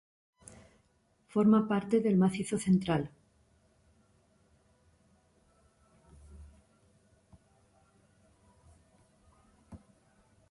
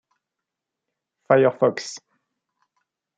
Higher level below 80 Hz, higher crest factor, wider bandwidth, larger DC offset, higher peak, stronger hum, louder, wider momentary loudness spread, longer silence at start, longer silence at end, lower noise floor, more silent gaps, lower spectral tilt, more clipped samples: first, -64 dBFS vs -76 dBFS; about the same, 20 dB vs 22 dB; first, 11.5 kHz vs 9.2 kHz; neither; second, -16 dBFS vs -4 dBFS; neither; second, -29 LUFS vs -19 LUFS; first, 29 LU vs 18 LU; about the same, 1.35 s vs 1.3 s; second, 0.75 s vs 1.2 s; second, -71 dBFS vs -85 dBFS; neither; first, -7 dB/octave vs -5.5 dB/octave; neither